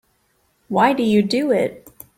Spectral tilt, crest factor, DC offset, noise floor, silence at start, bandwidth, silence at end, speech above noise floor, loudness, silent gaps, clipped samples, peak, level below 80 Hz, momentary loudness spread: -6 dB/octave; 18 dB; under 0.1%; -64 dBFS; 0.7 s; 16 kHz; 0.4 s; 47 dB; -18 LUFS; none; under 0.1%; -2 dBFS; -60 dBFS; 8 LU